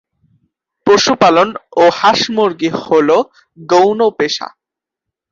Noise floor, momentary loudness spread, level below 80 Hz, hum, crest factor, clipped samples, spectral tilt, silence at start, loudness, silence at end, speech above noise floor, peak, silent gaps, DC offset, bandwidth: -83 dBFS; 9 LU; -56 dBFS; none; 14 dB; under 0.1%; -4 dB/octave; 0.85 s; -12 LUFS; 0.85 s; 71 dB; 0 dBFS; none; under 0.1%; 7.6 kHz